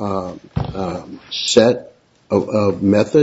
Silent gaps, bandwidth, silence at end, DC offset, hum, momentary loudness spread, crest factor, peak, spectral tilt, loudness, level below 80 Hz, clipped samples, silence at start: none; 8 kHz; 0 s; under 0.1%; none; 13 LU; 18 dB; 0 dBFS; -5 dB/octave; -18 LUFS; -42 dBFS; under 0.1%; 0 s